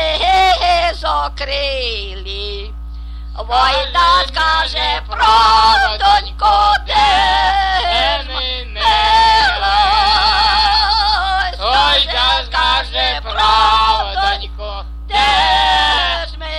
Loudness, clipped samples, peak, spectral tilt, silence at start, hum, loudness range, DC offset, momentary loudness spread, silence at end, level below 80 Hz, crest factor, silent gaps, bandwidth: -13 LUFS; under 0.1%; 0 dBFS; -2.5 dB/octave; 0 s; none; 5 LU; under 0.1%; 13 LU; 0 s; -26 dBFS; 14 dB; none; 12 kHz